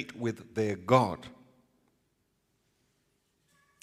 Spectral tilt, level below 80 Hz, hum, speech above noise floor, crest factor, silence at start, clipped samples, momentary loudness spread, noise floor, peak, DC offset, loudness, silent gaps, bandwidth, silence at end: -6.5 dB/octave; -70 dBFS; none; 46 dB; 26 dB; 0 s; under 0.1%; 16 LU; -76 dBFS; -8 dBFS; under 0.1%; -29 LUFS; none; 15 kHz; 2.55 s